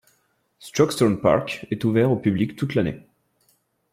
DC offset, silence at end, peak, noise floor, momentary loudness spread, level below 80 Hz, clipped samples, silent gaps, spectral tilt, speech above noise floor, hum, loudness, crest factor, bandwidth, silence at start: under 0.1%; 0.95 s; -4 dBFS; -67 dBFS; 9 LU; -54 dBFS; under 0.1%; none; -6.5 dB/octave; 46 dB; none; -22 LUFS; 18 dB; 16 kHz; 0.6 s